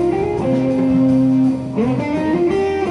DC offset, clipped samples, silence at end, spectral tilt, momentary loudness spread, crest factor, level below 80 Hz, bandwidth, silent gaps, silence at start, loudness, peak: under 0.1%; under 0.1%; 0 s; -8.5 dB/octave; 5 LU; 10 dB; -42 dBFS; 10 kHz; none; 0 s; -17 LUFS; -6 dBFS